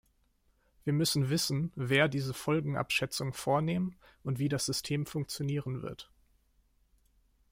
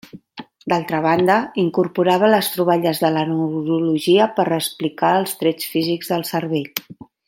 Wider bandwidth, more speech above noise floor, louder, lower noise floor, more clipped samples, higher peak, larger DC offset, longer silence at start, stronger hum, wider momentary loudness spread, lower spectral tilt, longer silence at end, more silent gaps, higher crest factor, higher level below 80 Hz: about the same, 16.5 kHz vs 17 kHz; first, 39 dB vs 22 dB; second, -32 LUFS vs -19 LUFS; first, -71 dBFS vs -40 dBFS; neither; second, -14 dBFS vs 0 dBFS; neither; first, 0.85 s vs 0.15 s; neither; first, 11 LU vs 8 LU; about the same, -5 dB/octave vs -5 dB/octave; first, 1.5 s vs 0.35 s; neither; about the same, 20 dB vs 18 dB; about the same, -62 dBFS vs -64 dBFS